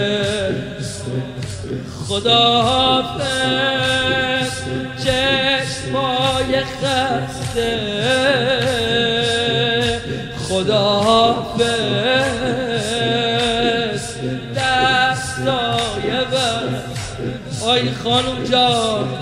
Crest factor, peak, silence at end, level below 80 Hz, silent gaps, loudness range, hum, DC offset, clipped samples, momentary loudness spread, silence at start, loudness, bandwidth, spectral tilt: 16 dB; -2 dBFS; 0 s; -42 dBFS; none; 2 LU; none; under 0.1%; under 0.1%; 11 LU; 0 s; -17 LUFS; 15.5 kHz; -4 dB/octave